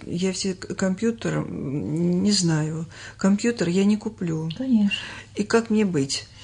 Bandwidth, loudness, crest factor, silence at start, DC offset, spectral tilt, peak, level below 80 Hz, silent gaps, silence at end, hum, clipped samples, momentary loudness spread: 10.5 kHz; -24 LUFS; 16 dB; 0 s; under 0.1%; -5 dB/octave; -8 dBFS; -56 dBFS; none; 0 s; none; under 0.1%; 8 LU